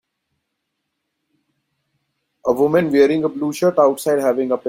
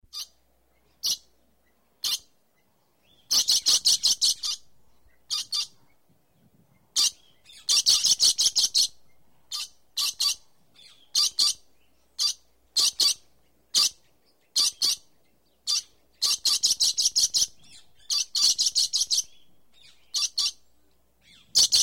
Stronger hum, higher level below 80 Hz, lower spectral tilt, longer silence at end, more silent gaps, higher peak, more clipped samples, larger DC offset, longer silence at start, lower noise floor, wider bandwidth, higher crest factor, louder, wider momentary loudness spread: neither; about the same, -62 dBFS vs -66 dBFS; first, -6 dB/octave vs 3.5 dB/octave; about the same, 0 s vs 0 s; neither; first, -2 dBFS vs -8 dBFS; neither; second, under 0.1% vs 0.1%; first, 2.45 s vs 0.15 s; first, -76 dBFS vs -69 dBFS; about the same, 16.5 kHz vs 16.5 kHz; about the same, 18 dB vs 20 dB; first, -17 LUFS vs -23 LUFS; second, 7 LU vs 15 LU